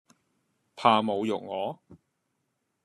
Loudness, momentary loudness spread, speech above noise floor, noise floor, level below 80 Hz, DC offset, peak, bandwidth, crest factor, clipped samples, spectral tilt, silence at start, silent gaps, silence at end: -27 LUFS; 13 LU; 52 dB; -78 dBFS; -76 dBFS; under 0.1%; -6 dBFS; 12 kHz; 24 dB; under 0.1%; -5.5 dB/octave; 0.75 s; none; 0.9 s